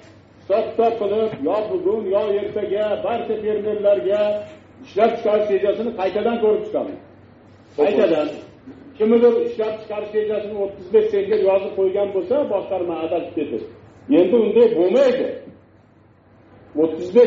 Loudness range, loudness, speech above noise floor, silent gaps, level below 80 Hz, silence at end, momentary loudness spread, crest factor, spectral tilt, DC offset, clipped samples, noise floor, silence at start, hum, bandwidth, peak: 2 LU; -20 LUFS; 33 dB; none; -60 dBFS; 0 s; 12 LU; 18 dB; -5 dB/octave; under 0.1%; under 0.1%; -52 dBFS; 0.5 s; none; 7.2 kHz; -2 dBFS